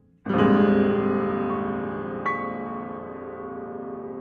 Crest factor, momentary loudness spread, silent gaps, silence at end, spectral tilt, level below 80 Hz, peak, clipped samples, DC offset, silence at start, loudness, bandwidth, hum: 18 dB; 16 LU; none; 0 s; -9.5 dB/octave; -58 dBFS; -6 dBFS; under 0.1%; under 0.1%; 0.25 s; -25 LUFS; 4.6 kHz; none